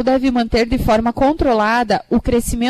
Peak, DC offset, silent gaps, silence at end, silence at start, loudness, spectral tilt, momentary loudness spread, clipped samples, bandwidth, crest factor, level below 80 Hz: -6 dBFS; under 0.1%; none; 0 s; 0 s; -16 LUFS; -5.5 dB/octave; 2 LU; under 0.1%; 14 kHz; 10 dB; -28 dBFS